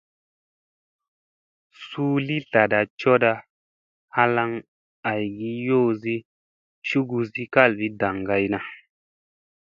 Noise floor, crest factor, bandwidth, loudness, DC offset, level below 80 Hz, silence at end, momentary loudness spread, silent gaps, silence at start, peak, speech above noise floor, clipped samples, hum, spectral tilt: under -90 dBFS; 24 dB; 7.2 kHz; -23 LUFS; under 0.1%; -62 dBFS; 0.95 s; 12 LU; 2.90-2.97 s, 3.50-4.08 s, 4.68-5.03 s, 6.25-6.82 s; 1.8 s; 0 dBFS; over 68 dB; under 0.1%; none; -7.5 dB/octave